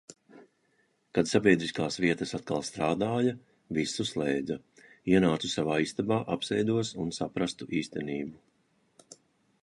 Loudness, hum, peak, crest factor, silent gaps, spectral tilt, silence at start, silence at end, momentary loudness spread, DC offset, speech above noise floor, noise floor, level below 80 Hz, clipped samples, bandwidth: -30 LUFS; none; -8 dBFS; 22 dB; none; -5 dB/octave; 0.35 s; 1.3 s; 10 LU; under 0.1%; 42 dB; -71 dBFS; -60 dBFS; under 0.1%; 11.5 kHz